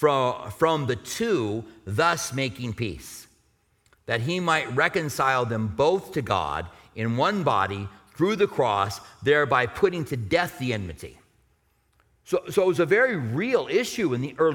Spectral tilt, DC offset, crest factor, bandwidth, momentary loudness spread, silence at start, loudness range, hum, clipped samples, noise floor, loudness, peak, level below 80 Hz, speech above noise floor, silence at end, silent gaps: -5 dB/octave; under 0.1%; 20 dB; 18 kHz; 10 LU; 0 s; 3 LU; none; under 0.1%; -67 dBFS; -25 LUFS; -6 dBFS; -54 dBFS; 42 dB; 0 s; none